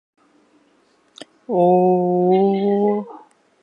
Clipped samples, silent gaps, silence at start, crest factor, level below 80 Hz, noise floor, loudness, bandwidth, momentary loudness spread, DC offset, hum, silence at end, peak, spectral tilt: under 0.1%; none; 1.2 s; 16 dB; -70 dBFS; -59 dBFS; -17 LUFS; 8.6 kHz; 12 LU; under 0.1%; none; 0.45 s; -4 dBFS; -9.5 dB/octave